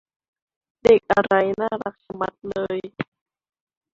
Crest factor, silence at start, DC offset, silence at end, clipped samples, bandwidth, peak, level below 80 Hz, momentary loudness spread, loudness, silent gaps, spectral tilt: 20 dB; 0.85 s; under 0.1%; 0.9 s; under 0.1%; 7.6 kHz; -2 dBFS; -54 dBFS; 16 LU; -21 LUFS; none; -6 dB/octave